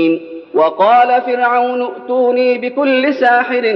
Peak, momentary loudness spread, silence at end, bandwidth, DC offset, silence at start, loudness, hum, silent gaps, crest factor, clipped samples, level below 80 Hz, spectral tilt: 0 dBFS; 8 LU; 0 s; 5.8 kHz; under 0.1%; 0 s; -13 LUFS; none; none; 12 dB; under 0.1%; -68 dBFS; -6.5 dB/octave